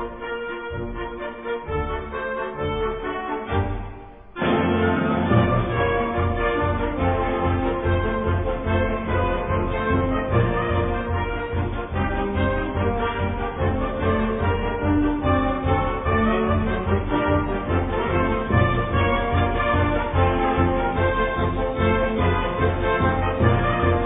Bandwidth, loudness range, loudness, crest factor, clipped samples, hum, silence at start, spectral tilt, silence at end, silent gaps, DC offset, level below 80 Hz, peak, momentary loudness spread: 3.9 kHz; 3 LU; -23 LUFS; 16 dB; under 0.1%; none; 0 s; -11 dB/octave; 0 s; none; under 0.1%; -32 dBFS; -6 dBFS; 8 LU